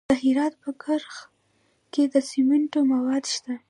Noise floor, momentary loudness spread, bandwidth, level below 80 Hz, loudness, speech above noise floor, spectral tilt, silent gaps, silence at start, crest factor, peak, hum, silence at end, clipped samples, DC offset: -67 dBFS; 10 LU; 11 kHz; -62 dBFS; -24 LUFS; 43 dB; -3.5 dB/octave; none; 0.1 s; 16 dB; -8 dBFS; none; 0.1 s; under 0.1%; under 0.1%